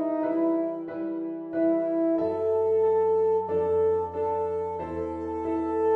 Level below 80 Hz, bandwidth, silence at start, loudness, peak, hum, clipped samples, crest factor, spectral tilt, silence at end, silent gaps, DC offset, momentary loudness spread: -56 dBFS; 4.3 kHz; 0 s; -26 LUFS; -16 dBFS; none; under 0.1%; 10 dB; -9.5 dB/octave; 0 s; none; under 0.1%; 9 LU